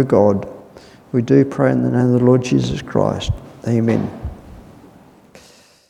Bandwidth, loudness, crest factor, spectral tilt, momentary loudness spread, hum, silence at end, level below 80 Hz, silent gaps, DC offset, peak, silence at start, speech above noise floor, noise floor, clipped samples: 10.5 kHz; -17 LUFS; 18 dB; -7.5 dB/octave; 12 LU; none; 1.3 s; -40 dBFS; none; under 0.1%; 0 dBFS; 0 s; 33 dB; -48 dBFS; under 0.1%